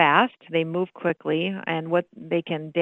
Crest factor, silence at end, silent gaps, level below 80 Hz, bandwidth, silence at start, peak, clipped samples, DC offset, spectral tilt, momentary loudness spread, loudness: 20 dB; 0 s; none; -74 dBFS; 4.1 kHz; 0 s; -4 dBFS; under 0.1%; under 0.1%; -8 dB/octave; 6 LU; -25 LUFS